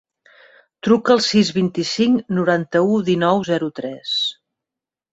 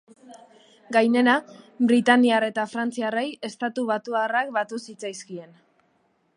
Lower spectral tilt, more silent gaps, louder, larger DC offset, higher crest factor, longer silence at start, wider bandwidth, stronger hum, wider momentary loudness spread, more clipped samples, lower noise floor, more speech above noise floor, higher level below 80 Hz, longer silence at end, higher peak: about the same, -5 dB/octave vs -4.5 dB/octave; neither; first, -18 LUFS vs -23 LUFS; neither; about the same, 18 dB vs 20 dB; first, 0.85 s vs 0.3 s; second, 8 kHz vs 11 kHz; neither; second, 8 LU vs 16 LU; neither; first, -87 dBFS vs -67 dBFS; first, 70 dB vs 44 dB; first, -60 dBFS vs -80 dBFS; about the same, 0.8 s vs 0.9 s; about the same, -2 dBFS vs -4 dBFS